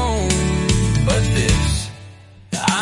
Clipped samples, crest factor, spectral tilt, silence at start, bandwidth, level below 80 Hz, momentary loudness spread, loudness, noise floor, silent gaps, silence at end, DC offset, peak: under 0.1%; 14 dB; -4.5 dB/octave; 0 s; 11.5 kHz; -26 dBFS; 11 LU; -18 LUFS; -41 dBFS; none; 0 s; under 0.1%; -4 dBFS